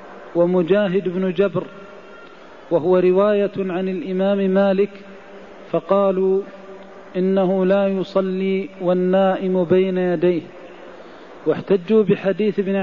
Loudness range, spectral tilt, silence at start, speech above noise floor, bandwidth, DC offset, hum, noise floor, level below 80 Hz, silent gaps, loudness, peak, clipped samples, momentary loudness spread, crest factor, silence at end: 2 LU; -9 dB/octave; 0 s; 24 dB; 5.4 kHz; 0.4%; none; -42 dBFS; -60 dBFS; none; -19 LUFS; -4 dBFS; under 0.1%; 22 LU; 14 dB; 0 s